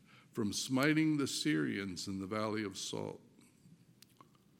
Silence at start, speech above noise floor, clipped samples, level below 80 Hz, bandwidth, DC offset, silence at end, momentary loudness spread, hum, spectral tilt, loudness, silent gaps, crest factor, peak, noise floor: 0.15 s; 29 dB; under 0.1%; -80 dBFS; 16.5 kHz; under 0.1%; 0.9 s; 12 LU; none; -4.5 dB/octave; -36 LUFS; none; 20 dB; -16 dBFS; -65 dBFS